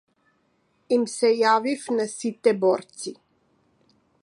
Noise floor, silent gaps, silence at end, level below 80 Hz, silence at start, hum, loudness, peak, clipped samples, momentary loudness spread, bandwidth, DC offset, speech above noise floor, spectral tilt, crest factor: -68 dBFS; none; 1.1 s; -78 dBFS; 0.9 s; none; -23 LUFS; -6 dBFS; under 0.1%; 13 LU; 11.5 kHz; under 0.1%; 45 dB; -4 dB/octave; 20 dB